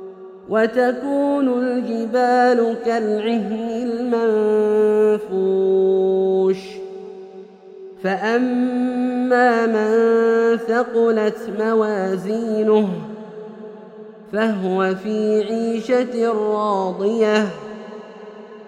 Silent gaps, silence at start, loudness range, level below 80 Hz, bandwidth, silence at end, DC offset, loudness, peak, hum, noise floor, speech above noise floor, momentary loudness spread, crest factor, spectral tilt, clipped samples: none; 0 s; 4 LU; -64 dBFS; 9.8 kHz; 0 s; under 0.1%; -19 LUFS; -4 dBFS; none; -40 dBFS; 22 dB; 19 LU; 16 dB; -6.5 dB/octave; under 0.1%